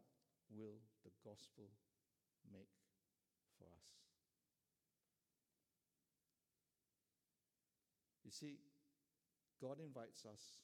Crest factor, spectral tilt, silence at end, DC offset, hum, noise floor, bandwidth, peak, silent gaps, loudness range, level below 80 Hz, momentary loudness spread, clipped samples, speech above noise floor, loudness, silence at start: 24 dB; -4.5 dB/octave; 0 s; under 0.1%; none; under -90 dBFS; 14 kHz; -40 dBFS; none; 9 LU; under -90 dBFS; 13 LU; under 0.1%; over 30 dB; -60 LUFS; 0 s